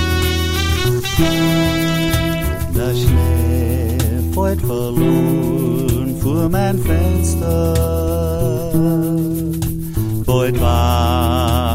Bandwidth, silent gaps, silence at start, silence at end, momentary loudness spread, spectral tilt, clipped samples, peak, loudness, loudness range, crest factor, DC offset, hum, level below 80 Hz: 16.5 kHz; none; 0 s; 0 s; 4 LU; -6 dB/octave; under 0.1%; 0 dBFS; -17 LUFS; 1 LU; 14 dB; under 0.1%; none; -24 dBFS